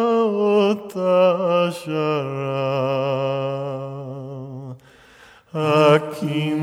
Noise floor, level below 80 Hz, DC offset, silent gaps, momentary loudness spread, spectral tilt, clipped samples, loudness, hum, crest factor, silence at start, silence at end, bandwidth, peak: -49 dBFS; -68 dBFS; under 0.1%; none; 16 LU; -7 dB/octave; under 0.1%; -20 LUFS; none; 20 dB; 0 s; 0 s; 15.5 kHz; -2 dBFS